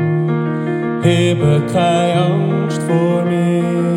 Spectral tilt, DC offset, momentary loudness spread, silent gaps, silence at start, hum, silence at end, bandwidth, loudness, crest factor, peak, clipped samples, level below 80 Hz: -7 dB/octave; under 0.1%; 5 LU; none; 0 s; none; 0 s; 11.5 kHz; -15 LUFS; 14 dB; -2 dBFS; under 0.1%; -52 dBFS